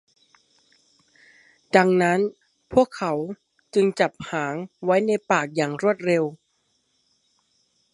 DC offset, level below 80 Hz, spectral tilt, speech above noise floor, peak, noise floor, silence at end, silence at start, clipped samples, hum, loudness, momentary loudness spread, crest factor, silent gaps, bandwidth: under 0.1%; -62 dBFS; -6 dB/octave; 48 dB; -2 dBFS; -70 dBFS; 1.6 s; 1.75 s; under 0.1%; none; -23 LUFS; 10 LU; 24 dB; none; 11.5 kHz